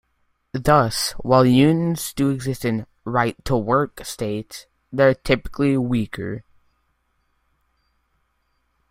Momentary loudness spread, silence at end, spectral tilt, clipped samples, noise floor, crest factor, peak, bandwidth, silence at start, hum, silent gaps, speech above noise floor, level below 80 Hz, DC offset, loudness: 14 LU; 2.5 s; -6 dB/octave; under 0.1%; -69 dBFS; 20 dB; -2 dBFS; 16 kHz; 0.55 s; none; none; 49 dB; -44 dBFS; under 0.1%; -20 LUFS